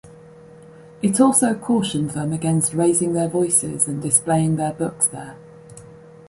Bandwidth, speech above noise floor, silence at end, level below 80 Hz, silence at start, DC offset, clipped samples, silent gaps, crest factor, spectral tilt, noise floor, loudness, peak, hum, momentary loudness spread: 11.5 kHz; 24 dB; 0.35 s; -56 dBFS; 0.05 s; under 0.1%; under 0.1%; none; 18 dB; -5 dB/octave; -44 dBFS; -19 LUFS; -2 dBFS; none; 8 LU